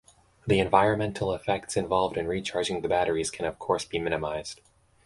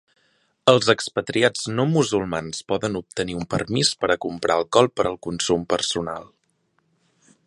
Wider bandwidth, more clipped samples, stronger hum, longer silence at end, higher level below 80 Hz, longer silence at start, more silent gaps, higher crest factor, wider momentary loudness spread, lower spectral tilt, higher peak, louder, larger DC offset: about the same, 11.5 kHz vs 11.5 kHz; neither; neither; second, 0.5 s vs 1.2 s; about the same, -52 dBFS vs -52 dBFS; second, 0.45 s vs 0.65 s; neither; about the same, 22 dB vs 22 dB; about the same, 11 LU vs 9 LU; about the same, -4.5 dB/octave vs -4 dB/octave; second, -4 dBFS vs 0 dBFS; second, -27 LUFS vs -22 LUFS; neither